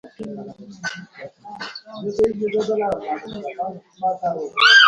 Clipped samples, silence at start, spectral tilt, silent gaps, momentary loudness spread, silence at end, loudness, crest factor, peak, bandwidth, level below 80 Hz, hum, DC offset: under 0.1%; 0.05 s; -2.5 dB/octave; none; 15 LU; 0 s; -22 LUFS; 20 dB; 0 dBFS; 10.5 kHz; -58 dBFS; none; under 0.1%